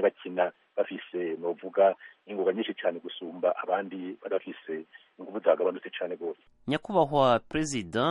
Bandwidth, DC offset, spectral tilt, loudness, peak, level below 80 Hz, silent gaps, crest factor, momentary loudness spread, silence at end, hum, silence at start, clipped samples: 11.5 kHz; under 0.1%; -5 dB/octave; -30 LUFS; -10 dBFS; -62 dBFS; none; 20 dB; 14 LU; 0 s; none; 0 s; under 0.1%